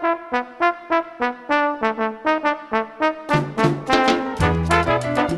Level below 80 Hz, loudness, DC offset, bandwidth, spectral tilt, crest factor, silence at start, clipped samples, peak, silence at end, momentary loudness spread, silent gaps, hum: -40 dBFS; -20 LUFS; under 0.1%; 12.5 kHz; -6 dB/octave; 20 dB; 0 s; under 0.1%; 0 dBFS; 0 s; 6 LU; none; none